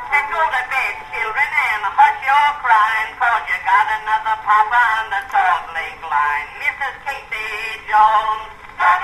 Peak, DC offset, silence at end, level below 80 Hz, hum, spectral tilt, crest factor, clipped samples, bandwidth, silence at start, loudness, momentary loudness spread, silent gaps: 0 dBFS; under 0.1%; 0 s; -50 dBFS; none; -1 dB/octave; 16 dB; under 0.1%; 13.5 kHz; 0 s; -17 LUFS; 10 LU; none